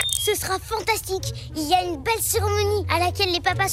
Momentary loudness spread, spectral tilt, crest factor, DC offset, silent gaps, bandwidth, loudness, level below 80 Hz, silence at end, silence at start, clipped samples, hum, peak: 7 LU; -3 dB/octave; 22 dB; under 0.1%; none; 16 kHz; -23 LUFS; -40 dBFS; 0 s; 0 s; under 0.1%; none; -2 dBFS